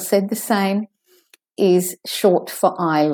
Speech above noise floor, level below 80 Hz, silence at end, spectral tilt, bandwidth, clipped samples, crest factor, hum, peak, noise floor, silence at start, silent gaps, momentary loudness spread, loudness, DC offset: 38 dB; -74 dBFS; 0 s; -5 dB/octave; 19 kHz; under 0.1%; 16 dB; none; -2 dBFS; -56 dBFS; 0 s; none; 8 LU; -19 LUFS; under 0.1%